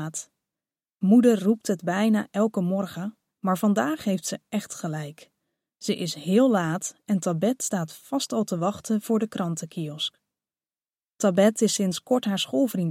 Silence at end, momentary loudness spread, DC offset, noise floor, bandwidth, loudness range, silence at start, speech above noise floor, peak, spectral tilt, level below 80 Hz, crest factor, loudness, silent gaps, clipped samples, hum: 0 s; 11 LU; under 0.1%; under -90 dBFS; 16.5 kHz; 5 LU; 0 s; over 66 dB; -8 dBFS; -5 dB/octave; -72 dBFS; 18 dB; -25 LUFS; none; under 0.1%; none